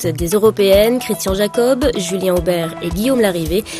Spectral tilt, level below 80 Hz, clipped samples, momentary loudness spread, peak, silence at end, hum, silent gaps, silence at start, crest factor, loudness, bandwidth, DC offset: -5 dB/octave; -32 dBFS; under 0.1%; 7 LU; 0 dBFS; 0 s; none; none; 0 s; 14 dB; -15 LUFS; 15 kHz; under 0.1%